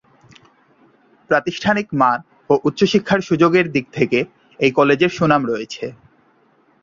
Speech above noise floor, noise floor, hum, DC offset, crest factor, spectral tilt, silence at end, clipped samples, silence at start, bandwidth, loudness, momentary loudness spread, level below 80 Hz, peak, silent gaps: 40 dB; -57 dBFS; none; under 0.1%; 18 dB; -6 dB/octave; 0.9 s; under 0.1%; 1.3 s; 7.6 kHz; -17 LUFS; 10 LU; -56 dBFS; -2 dBFS; none